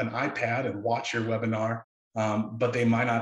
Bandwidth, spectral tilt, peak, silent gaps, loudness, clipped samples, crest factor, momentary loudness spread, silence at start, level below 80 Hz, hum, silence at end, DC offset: 11 kHz; -6.5 dB/octave; -12 dBFS; 1.84-2.11 s; -28 LUFS; under 0.1%; 16 dB; 7 LU; 0 s; -68 dBFS; none; 0 s; under 0.1%